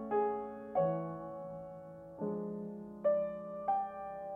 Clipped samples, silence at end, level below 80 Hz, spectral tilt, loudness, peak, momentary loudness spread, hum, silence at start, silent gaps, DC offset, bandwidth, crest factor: under 0.1%; 0 s; -72 dBFS; -10.5 dB/octave; -38 LUFS; -22 dBFS; 13 LU; none; 0 s; none; under 0.1%; 3.6 kHz; 16 dB